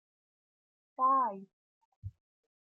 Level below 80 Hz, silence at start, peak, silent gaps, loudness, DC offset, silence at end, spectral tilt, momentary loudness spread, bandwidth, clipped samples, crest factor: -70 dBFS; 1 s; -20 dBFS; 1.53-2.02 s; -30 LUFS; under 0.1%; 0.55 s; -10.5 dB/octave; 22 LU; 2.7 kHz; under 0.1%; 18 dB